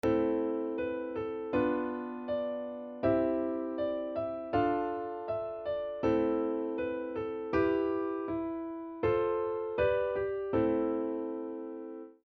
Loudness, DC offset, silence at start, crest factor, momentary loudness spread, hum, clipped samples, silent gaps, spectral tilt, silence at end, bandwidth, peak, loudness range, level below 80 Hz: -33 LUFS; under 0.1%; 0.05 s; 16 dB; 8 LU; none; under 0.1%; none; -6 dB/octave; 0.15 s; 6.2 kHz; -16 dBFS; 1 LU; -58 dBFS